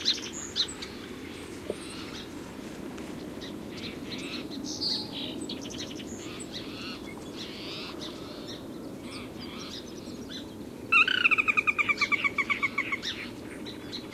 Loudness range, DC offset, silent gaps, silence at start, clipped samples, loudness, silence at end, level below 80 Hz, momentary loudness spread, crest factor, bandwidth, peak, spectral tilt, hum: 14 LU; under 0.1%; none; 0 s; under 0.1%; -30 LUFS; 0 s; -58 dBFS; 17 LU; 22 dB; 16 kHz; -10 dBFS; -2.5 dB/octave; none